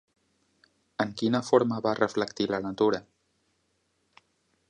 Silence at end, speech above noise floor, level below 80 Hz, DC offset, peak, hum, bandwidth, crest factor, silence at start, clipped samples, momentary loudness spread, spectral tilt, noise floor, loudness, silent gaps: 1.7 s; 47 dB; -68 dBFS; under 0.1%; -8 dBFS; none; 10.5 kHz; 22 dB; 1 s; under 0.1%; 9 LU; -5.5 dB/octave; -74 dBFS; -27 LUFS; none